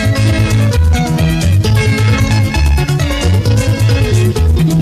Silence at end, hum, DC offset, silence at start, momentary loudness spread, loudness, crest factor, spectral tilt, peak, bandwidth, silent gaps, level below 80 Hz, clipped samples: 0 s; none; under 0.1%; 0 s; 2 LU; -12 LUFS; 10 dB; -6 dB/octave; 0 dBFS; 15 kHz; none; -20 dBFS; under 0.1%